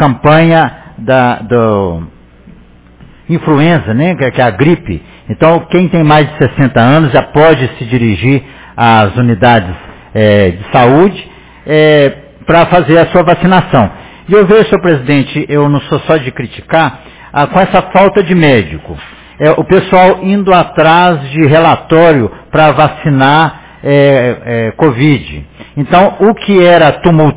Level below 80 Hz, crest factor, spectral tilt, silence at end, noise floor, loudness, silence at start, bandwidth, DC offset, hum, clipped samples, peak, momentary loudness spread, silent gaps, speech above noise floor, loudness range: -34 dBFS; 8 dB; -11 dB/octave; 0 s; -37 dBFS; -8 LUFS; 0 s; 4 kHz; under 0.1%; none; 2%; 0 dBFS; 11 LU; none; 30 dB; 4 LU